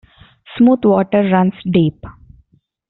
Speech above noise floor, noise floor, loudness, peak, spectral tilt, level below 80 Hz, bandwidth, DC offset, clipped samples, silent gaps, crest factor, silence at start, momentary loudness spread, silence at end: 42 dB; -55 dBFS; -14 LUFS; -2 dBFS; -7 dB/octave; -48 dBFS; 4.1 kHz; under 0.1%; under 0.1%; none; 14 dB; 0.5 s; 5 LU; 0.8 s